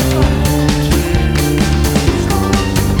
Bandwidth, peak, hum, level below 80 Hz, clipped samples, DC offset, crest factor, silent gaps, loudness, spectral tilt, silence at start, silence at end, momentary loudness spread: over 20 kHz; 0 dBFS; none; -18 dBFS; under 0.1%; under 0.1%; 12 dB; none; -14 LUFS; -5.5 dB/octave; 0 s; 0 s; 1 LU